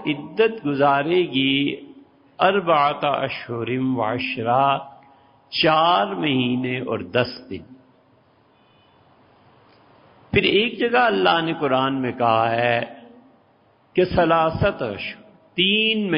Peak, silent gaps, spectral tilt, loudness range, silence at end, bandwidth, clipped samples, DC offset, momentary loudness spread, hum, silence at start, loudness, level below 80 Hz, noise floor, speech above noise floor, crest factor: -4 dBFS; none; -10 dB/octave; 6 LU; 0 s; 5.4 kHz; under 0.1%; under 0.1%; 10 LU; none; 0 s; -20 LUFS; -50 dBFS; -58 dBFS; 38 dB; 18 dB